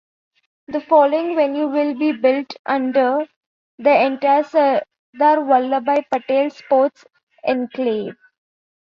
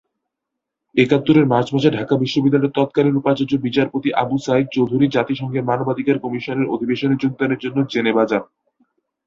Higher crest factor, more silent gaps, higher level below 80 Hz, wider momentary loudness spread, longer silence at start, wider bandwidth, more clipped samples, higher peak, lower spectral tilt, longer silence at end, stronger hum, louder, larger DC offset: about the same, 16 dB vs 18 dB; first, 2.59-2.64 s, 3.36-3.78 s, 4.99-5.13 s, 7.23-7.27 s vs none; second, -70 dBFS vs -58 dBFS; about the same, 8 LU vs 6 LU; second, 0.7 s vs 0.95 s; about the same, 7 kHz vs 7.6 kHz; neither; about the same, -2 dBFS vs 0 dBFS; second, -6 dB/octave vs -7.5 dB/octave; second, 0.7 s vs 0.85 s; neither; about the same, -18 LUFS vs -18 LUFS; neither